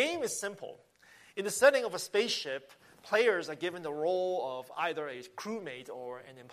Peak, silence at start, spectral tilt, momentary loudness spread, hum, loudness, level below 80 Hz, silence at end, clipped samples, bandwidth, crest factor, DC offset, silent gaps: -12 dBFS; 0 s; -2.5 dB/octave; 17 LU; none; -32 LUFS; -82 dBFS; 0 s; under 0.1%; 15 kHz; 22 dB; under 0.1%; none